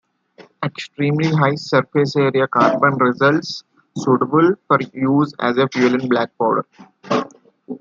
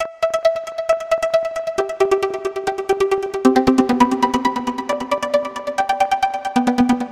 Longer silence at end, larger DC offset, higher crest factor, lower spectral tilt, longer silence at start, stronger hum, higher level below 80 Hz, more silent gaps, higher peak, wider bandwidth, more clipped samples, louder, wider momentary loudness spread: about the same, 0.05 s vs 0 s; neither; about the same, 16 dB vs 18 dB; first, -7 dB/octave vs -4.5 dB/octave; first, 0.4 s vs 0 s; neither; second, -64 dBFS vs -48 dBFS; neither; about the same, -2 dBFS vs 0 dBFS; second, 7.6 kHz vs 15 kHz; neither; about the same, -17 LUFS vs -19 LUFS; first, 11 LU vs 8 LU